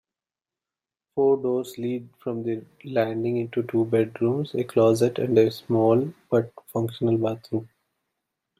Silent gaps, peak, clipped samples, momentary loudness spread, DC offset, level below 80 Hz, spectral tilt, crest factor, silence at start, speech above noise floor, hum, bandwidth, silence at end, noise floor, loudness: none; -6 dBFS; under 0.1%; 11 LU; under 0.1%; -68 dBFS; -7.5 dB/octave; 18 dB; 1.15 s; over 66 dB; none; 15 kHz; 0.95 s; under -90 dBFS; -24 LUFS